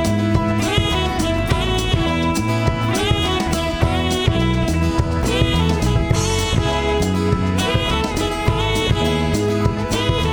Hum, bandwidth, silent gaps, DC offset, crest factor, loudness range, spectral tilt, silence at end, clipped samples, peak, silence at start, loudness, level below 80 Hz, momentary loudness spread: none; over 20 kHz; none; under 0.1%; 16 dB; 1 LU; -5 dB/octave; 0 s; under 0.1%; -2 dBFS; 0 s; -18 LUFS; -26 dBFS; 2 LU